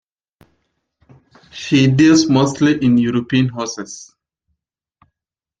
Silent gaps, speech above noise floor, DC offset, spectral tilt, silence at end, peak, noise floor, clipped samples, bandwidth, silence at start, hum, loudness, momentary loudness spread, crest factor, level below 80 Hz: none; 72 dB; under 0.1%; -5.5 dB/octave; 1.55 s; -2 dBFS; -86 dBFS; under 0.1%; 9.2 kHz; 1.55 s; none; -14 LUFS; 20 LU; 16 dB; -54 dBFS